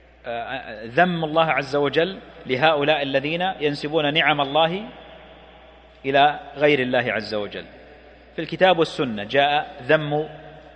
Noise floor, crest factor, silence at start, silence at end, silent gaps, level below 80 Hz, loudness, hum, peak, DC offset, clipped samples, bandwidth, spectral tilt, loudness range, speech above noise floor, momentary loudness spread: -48 dBFS; 20 dB; 0.25 s; 0.15 s; none; -54 dBFS; -21 LUFS; none; -2 dBFS; under 0.1%; under 0.1%; 9 kHz; -6 dB/octave; 2 LU; 26 dB; 14 LU